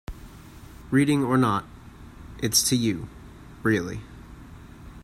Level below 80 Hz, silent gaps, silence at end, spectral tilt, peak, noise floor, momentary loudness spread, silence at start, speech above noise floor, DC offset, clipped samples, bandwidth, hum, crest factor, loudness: -48 dBFS; none; 0 s; -4 dB/octave; -6 dBFS; -45 dBFS; 25 LU; 0.1 s; 22 dB; under 0.1%; under 0.1%; 16 kHz; none; 20 dB; -24 LUFS